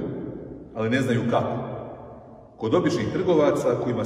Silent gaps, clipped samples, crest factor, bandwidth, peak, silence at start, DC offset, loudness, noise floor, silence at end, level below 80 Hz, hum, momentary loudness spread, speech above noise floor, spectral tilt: none; under 0.1%; 18 dB; 14 kHz; -8 dBFS; 0 s; under 0.1%; -24 LUFS; -45 dBFS; 0 s; -54 dBFS; none; 18 LU; 22 dB; -7 dB/octave